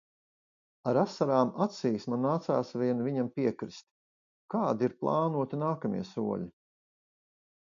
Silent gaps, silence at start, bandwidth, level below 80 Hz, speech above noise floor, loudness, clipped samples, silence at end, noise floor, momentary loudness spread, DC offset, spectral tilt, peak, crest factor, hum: 3.83-4.49 s; 0.85 s; 7.4 kHz; -72 dBFS; over 60 dB; -31 LUFS; under 0.1%; 1.15 s; under -90 dBFS; 9 LU; under 0.1%; -8 dB/octave; -12 dBFS; 20 dB; none